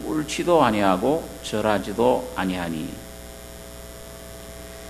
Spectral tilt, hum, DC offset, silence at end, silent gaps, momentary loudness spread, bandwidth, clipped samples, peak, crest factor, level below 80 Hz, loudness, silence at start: -5 dB/octave; 60 Hz at -45 dBFS; under 0.1%; 0 s; none; 20 LU; 13.5 kHz; under 0.1%; -4 dBFS; 20 dB; -44 dBFS; -22 LUFS; 0 s